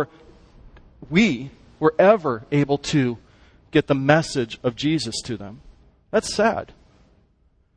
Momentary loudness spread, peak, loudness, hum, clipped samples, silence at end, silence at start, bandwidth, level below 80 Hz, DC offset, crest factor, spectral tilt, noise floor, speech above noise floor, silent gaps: 15 LU; -2 dBFS; -21 LUFS; none; under 0.1%; 1.1 s; 0 s; 10.5 kHz; -50 dBFS; under 0.1%; 22 dB; -5.5 dB/octave; -61 dBFS; 41 dB; none